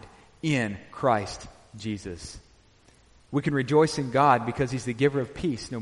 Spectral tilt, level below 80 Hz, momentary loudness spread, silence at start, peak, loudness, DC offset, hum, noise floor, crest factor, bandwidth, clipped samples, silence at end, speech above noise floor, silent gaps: -6 dB/octave; -52 dBFS; 16 LU; 0.05 s; -8 dBFS; -26 LUFS; under 0.1%; none; -58 dBFS; 20 dB; 11.5 kHz; under 0.1%; 0 s; 32 dB; none